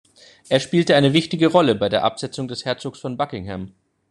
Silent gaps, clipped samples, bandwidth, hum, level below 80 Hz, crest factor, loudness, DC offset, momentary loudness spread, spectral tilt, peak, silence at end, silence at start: none; under 0.1%; 11 kHz; none; -58 dBFS; 18 dB; -20 LUFS; under 0.1%; 14 LU; -5.5 dB/octave; -2 dBFS; 0.4 s; 0.5 s